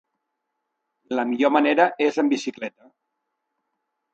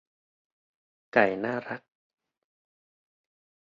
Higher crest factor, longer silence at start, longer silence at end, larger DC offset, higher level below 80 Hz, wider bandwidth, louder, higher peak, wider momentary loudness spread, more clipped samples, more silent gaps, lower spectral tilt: about the same, 22 dB vs 26 dB; about the same, 1.1 s vs 1.15 s; second, 1.45 s vs 1.85 s; neither; about the same, -78 dBFS vs -74 dBFS; first, 8.2 kHz vs 7.4 kHz; first, -21 LUFS vs -27 LUFS; about the same, -4 dBFS vs -6 dBFS; about the same, 14 LU vs 16 LU; neither; neither; about the same, -4 dB/octave vs -4 dB/octave